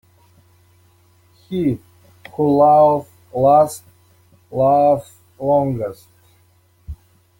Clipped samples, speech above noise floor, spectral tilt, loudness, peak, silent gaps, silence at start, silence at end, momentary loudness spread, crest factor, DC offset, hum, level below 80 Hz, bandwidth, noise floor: under 0.1%; 41 dB; -8 dB/octave; -16 LUFS; -2 dBFS; none; 1.5 s; 0.45 s; 21 LU; 16 dB; under 0.1%; none; -50 dBFS; 17 kHz; -56 dBFS